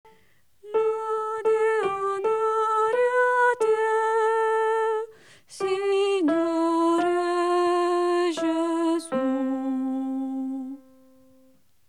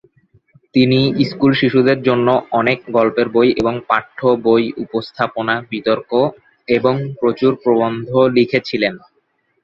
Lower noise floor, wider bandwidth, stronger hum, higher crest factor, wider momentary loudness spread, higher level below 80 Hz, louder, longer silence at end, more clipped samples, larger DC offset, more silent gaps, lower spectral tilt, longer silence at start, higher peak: about the same, -63 dBFS vs -64 dBFS; first, 11.5 kHz vs 6.8 kHz; neither; about the same, 14 dB vs 14 dB; about the same, 8 LU vs 6 LU; second, -76 dBFS vs -52 dBFS; second, -24 LUFS vs -16 LUFS; first, 1.1 s vs 0.65 s; neither; first, 0.1% vs under 0.1%; neither; second, -4 dB/octave vs -8 dB/octave; about the same, 0.65 s vs 0.75 s; second, -10 dBFS vs 0 dBFS